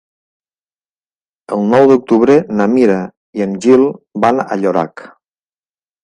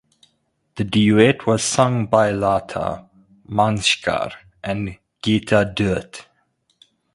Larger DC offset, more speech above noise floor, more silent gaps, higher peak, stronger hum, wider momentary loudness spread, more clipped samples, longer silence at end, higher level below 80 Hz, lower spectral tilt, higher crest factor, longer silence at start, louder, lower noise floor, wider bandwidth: neither; first, over 78 dB vs 49 dB; first, 3.17-3.33 s vs none; about the same, 0 dBFS vs 0 dBFS; neither; second, 11 LU vs 15 LU; neither; about the same, 0.95 s vs 0.95 s; second, -56 dBFS vs -46 dBFS; first, -7 dB/octave vs -5 dB/octave; second, 14 dB vs 20 dB; first, 1.5 s vs 0.75 s; first, -12 LUFS vs -19 LUFS; first, under -90 dBFS vs -68 dBFS; second, 10 kHz vs 11.5 kHz